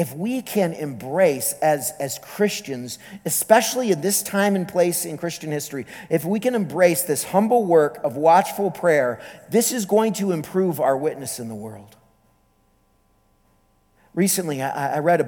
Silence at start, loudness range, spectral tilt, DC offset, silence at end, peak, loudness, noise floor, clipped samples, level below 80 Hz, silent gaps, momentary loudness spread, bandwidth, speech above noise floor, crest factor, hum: 0 s; 9 LU; -4.5 dB/octave; under 0.1%; 0 s; 0 dBFS; -21 LUFS; -62 dBFS; under 0.1%; -66 dBFS; none; 13 LU; 19.5 kHz; 41 dB; 22 dB; none